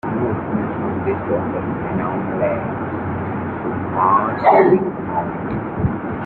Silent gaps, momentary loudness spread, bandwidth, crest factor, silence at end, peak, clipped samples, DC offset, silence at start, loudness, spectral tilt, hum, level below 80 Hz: none; 10 LU; 4.5 kHz; 18 dB; 0 s; -2 dBFS; under 0.1%; under 0.1%; 0.05 s; -19 LUFS; -11.5 dB/octave; none; -44 dBFS